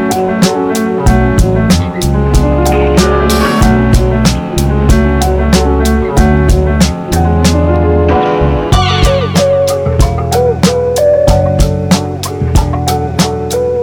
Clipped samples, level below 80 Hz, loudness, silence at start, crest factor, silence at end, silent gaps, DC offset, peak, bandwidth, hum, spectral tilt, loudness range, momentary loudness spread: under 0.1%; -16 dBFS; -10 LUFS; 0 s; 10 dB; 0 s; none; under 0.1%; 0 dBFS; over 20 kHz; none; -6 dB/octave; 1 LU; 4 LU